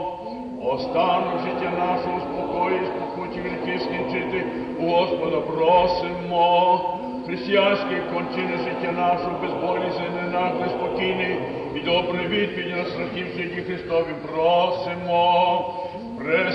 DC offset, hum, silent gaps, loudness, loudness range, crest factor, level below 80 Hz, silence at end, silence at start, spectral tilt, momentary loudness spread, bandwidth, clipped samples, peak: under 0.1%; none; none; -23 LUFS; 4 LU; 16 dB; -54 dBFS; 0 s; 0 s; -7 dB/octave; 10 LU; 6.2 kHz; under 0.1%; -6 dBFS